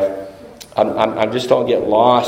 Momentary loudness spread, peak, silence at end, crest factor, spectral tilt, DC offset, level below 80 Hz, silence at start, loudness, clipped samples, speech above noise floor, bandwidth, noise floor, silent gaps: 18 LU; 0 dBFS; 0 s; 16 dB; -5.5 dB/octave; under 0.1%; -52 dBFS; 0 s; -16 LUFS; under 0.1%; 22 dB; 16 kHz; -37 dBFS; none